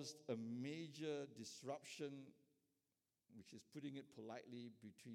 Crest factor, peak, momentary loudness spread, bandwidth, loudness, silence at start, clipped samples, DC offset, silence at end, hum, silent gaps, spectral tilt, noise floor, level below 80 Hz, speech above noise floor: 20 dB; -34 dBFS; 13 LU; 16 kHz; -53 LUFS; 0 s; under 0.1%; under 0.1%; 0 s; none; none; -5 dB/octave; under -90 dBFS; under -90 dBFS; over 38 dB